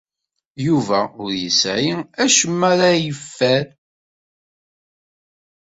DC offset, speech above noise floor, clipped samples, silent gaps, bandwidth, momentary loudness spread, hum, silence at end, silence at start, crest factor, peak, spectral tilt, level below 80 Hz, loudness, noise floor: under 0.1%; 61 dB; under 0.1%; none; 8.4 kHz; 10 LU; none; 2.05 s; 0.6 s; 20 dB; -2 dBFS; -3.5 dB/octave; -58 dBFS; -17 LUFS; -79 dBFS